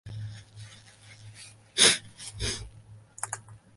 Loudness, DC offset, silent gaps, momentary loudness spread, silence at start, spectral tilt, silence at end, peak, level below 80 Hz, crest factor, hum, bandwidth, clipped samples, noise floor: -26 LUFS; under 0.1%; none; 28 LU; 0.05 s; -1 dB/octave; 0.2 s; -4 dBFS; -52 dBFS; 28 dB; none; 12 kHz; under 0.1%; -52 dBFS